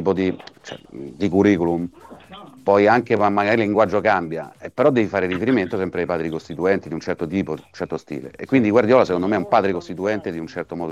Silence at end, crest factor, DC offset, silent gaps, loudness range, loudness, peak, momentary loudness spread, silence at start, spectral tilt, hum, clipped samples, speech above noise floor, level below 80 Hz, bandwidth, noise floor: 0 s; 18 dB; under 0.1%; none; 4 LU; -20 LUFS; -2 dBFS; 15 LU; 0 s; -7 dB/octave; none; under 0.1%; 22 dB; -56 dBFS; 10.5 kHz; -42 dBFS